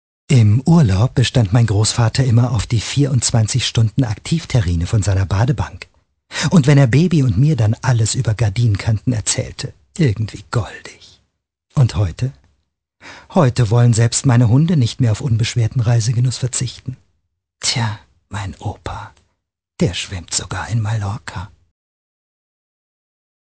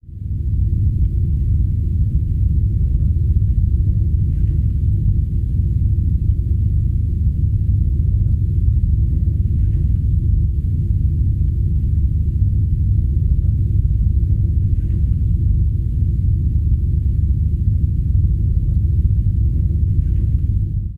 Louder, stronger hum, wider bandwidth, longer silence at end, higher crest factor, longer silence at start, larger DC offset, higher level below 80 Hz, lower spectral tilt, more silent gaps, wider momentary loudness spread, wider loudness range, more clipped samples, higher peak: about the same, -16 LUFS vs -18 LUFS; neither; first, 8 kHz vs 0.6 kHz; first, 2.05 s vs 0 s; about the same, 16 dB vs 12 dB; first, 0.3 s vs 0.05 s; neither; second, -34 dBFS vs -18 dBFS; second, -5.5 dB/octave vs -12 dB/octave; neither; first, 15 LU vs 2 LU; first, 8 LU vs 1 LU; neither; first, 0 dBFS vs -4 dBFS